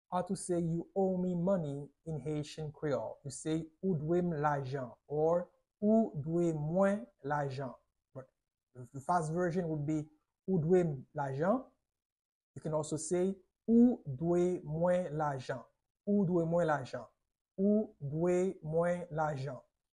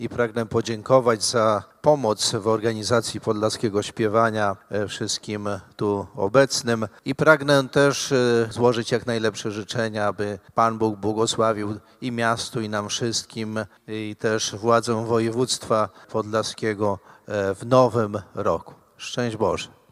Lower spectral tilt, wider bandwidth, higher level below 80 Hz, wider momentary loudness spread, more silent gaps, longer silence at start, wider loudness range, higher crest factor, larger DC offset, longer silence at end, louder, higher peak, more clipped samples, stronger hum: first, -7.5 dB/octave vs -4.5 dB/octave; second, 11 kHz vs 15.5 kHz; second, -66 dBFS vs -60 dBFS; first, 14 LU vs 10 LU; first, 12.05-12.54 s, 15.90-15.95 s, 17.41-17.45 s vs none; about the same, 0.1 s vs 0 s; about the same, 4 LU vs 4 LU; second, 16 dB vs 22 dB; neither; about the same, 0.35 s vs 0.25 s; second, -34 LUFS vs -23 LUFS; second, -18 dBFS vs 0 dBFS; neither; neither